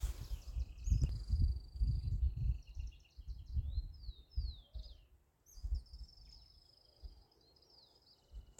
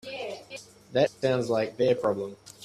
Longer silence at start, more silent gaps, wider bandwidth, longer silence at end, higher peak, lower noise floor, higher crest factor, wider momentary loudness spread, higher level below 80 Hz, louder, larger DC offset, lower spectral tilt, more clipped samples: about the same, 0 s vs 0.05 s; neither; first, 16 kHz vs 13 kHz; about the same, 0.1 s vs 0 s; second, -22 dBFS vs -10 dBFS; first, -69 dBFS vs -46 dBFS; about the same, 20 dB vs 18 dB; first, 23 LU vs 15 LU; first, -42 dBFS vs -66 dBFS; second, -42 LUFS vs -27 LUFS; neither; about the same, -6.5 dB/octave vs -5.5 dB/octave; neither